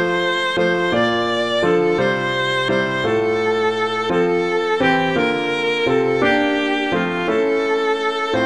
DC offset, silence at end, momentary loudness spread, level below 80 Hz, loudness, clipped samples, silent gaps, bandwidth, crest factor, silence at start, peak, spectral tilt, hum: 0.4%; 0 s; 3 LU; -52 dBFS; -18 LUFS; under 0.1%; none; 10.5 kHz; 14 dB; 0 s; -4 dBFS; -5 dB/octave; none